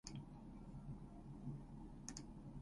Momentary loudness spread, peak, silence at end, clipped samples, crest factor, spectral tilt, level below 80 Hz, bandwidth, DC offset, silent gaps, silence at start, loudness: 4 LU; -30 dBFS; 0 s; under 0.1%; 22 dB; -5.5 dB/octave; -60 dBFS; 11 kHz; under 0.1%; none; 0.05 s; -55 LUFS